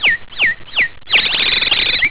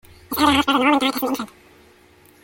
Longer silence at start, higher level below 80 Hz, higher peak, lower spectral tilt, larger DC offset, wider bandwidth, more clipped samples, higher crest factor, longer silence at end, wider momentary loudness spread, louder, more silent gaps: second, 0 s vs 0.3 s; first, -42 dBFS vs -50 dBFS; first, 0 dBFS vs -4 dBFS; about the same, -4.5 dB/octave vs -3.5 dB/octave; first, 2% vs under 0.1%; second, 4 kHz vs 17 kHz; neither; about the same, 14 dB vs 18 dB; second, 0 s vs 0.95 s; second, 5 LU vs 12 LU; first, -12 LUFS vs -19 LUFS; neither